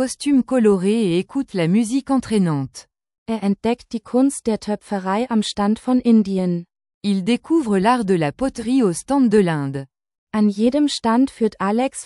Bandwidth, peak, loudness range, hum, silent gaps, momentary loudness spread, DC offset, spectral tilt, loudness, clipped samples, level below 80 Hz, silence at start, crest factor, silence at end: 12 kHz; -4 dBFS; 3 LU; none; 3.18-3.26 s, 6.94-7.01 s, 10.18-10.27 s; 8 LU; under 0.1%; -6 dB/octave; -19 LUFS; under 0.1%; -52 dBFS; 0 s; 14 dB; 0 s